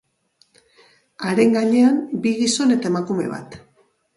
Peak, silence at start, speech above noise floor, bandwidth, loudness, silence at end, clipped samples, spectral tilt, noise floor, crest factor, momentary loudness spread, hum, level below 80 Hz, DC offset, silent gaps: -4 dBFS; 1.2 s; 43 dB; 11.5 kHz; -19 LUFS; 0.6 s; under 0.1%; -4.5 dB/octave; -62 dBFS; 16 dB; 11 LU; none; -64 dBFS; under 0.1%; none